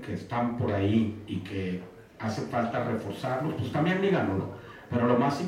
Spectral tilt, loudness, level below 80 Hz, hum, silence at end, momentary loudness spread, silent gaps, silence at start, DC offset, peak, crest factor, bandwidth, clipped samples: -7.5 dB/octave; -29 LUFS; -62 dBFS; none; 0 s; 11 LU; none; 0 s; under 0.1%; -10 dBFS; 18 dB; 14 kHz; under 0.1%